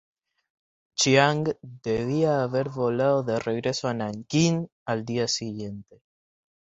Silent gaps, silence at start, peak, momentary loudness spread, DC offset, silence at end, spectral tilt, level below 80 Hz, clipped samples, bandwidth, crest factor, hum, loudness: 4.72-4.86 s; 1 s; -4 dBFS; 13 LU; under 0.1%; 0.9 s; -4.5 dB/octave; -60 dBFS; under 0.1%; 8.2 kHz; 22 dB; none; -25 LUFS